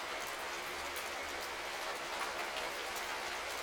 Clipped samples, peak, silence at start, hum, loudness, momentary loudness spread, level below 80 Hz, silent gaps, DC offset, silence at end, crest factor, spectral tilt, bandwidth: under 0.1%; -26 dBFS; 0 s; none; -39 LUFS; 2 LU; -64 dBFS; none; under 0.1%; 0 s; 16 dB; -0.5 dB/octave; over 20 kHz